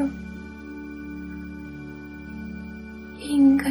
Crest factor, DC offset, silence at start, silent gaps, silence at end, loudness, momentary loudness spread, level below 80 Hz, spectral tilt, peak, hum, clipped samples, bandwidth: 18 dB; under 0.1%; 0 s; none; 0 s; -27 LUFS; 20 LU; -46 dBFS; -6 dB/octave; -8 dBFS; none; under 0.1%; over 20 kHz